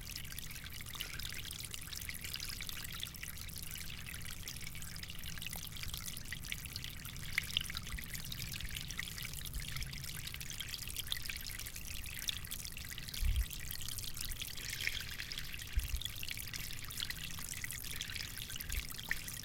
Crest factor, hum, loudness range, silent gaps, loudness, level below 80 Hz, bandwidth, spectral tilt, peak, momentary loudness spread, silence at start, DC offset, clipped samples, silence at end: 30 dB; none; 3 LU; none; -42 LUFS; -48 dBFS; 17 kHz; -1.5 dB/octave; -14 dBFS; 6 LU; 0 s; under 0.1%; under 0.1%; 0 s